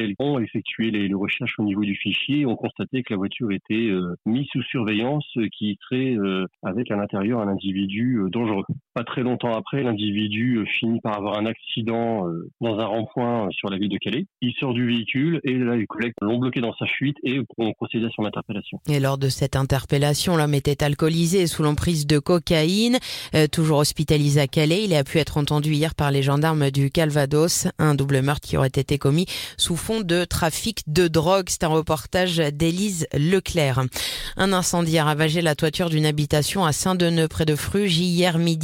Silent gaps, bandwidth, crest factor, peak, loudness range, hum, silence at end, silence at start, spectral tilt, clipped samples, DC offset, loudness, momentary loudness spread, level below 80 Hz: none; 17 kHz; 18 dB; -4 dBFS; 5 LU; none; 0 s; 0 s; -5 dB/octave; under 0.1%; under 0.1%; -22 LUFS; 6 LU; -46 dBFS